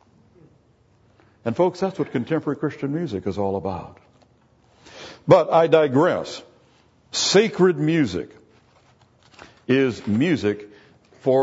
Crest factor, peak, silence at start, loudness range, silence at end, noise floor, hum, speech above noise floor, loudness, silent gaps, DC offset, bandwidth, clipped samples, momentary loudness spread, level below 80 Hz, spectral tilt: 22 dB; 0 dBFS; 1.45 s; 7 LU; 0 s; -58 dBFS; none; 38 dB; -21 LUFS; none; under 0.1%; 8 kHz; under 0.1%; 16 LU; -60 dBFS; -5.5 dB/octave